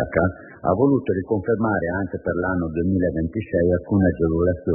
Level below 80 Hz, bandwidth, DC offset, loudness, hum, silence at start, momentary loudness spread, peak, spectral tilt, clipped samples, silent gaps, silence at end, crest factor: -44 dBFS; 3.2 kHz; under 0.1%; -22 LUFS; none; 0 s; 6 LU; -6 dBFS; -14 dB/octave; under 0.1%; none; 0 s; 16 dB